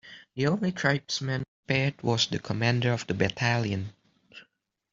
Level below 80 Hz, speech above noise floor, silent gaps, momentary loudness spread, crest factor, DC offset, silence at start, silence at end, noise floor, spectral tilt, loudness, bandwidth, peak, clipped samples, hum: -60 dBFS; 40 dB; 1.48-1.63 s; 7 LU; 22 dB; under 0.1%; 0.05 s; 0.5 s; -67 dBFS; -5 dB/octave; -28 LUFS; 7.8 kHz; -8 dBFS; under 0.1%; none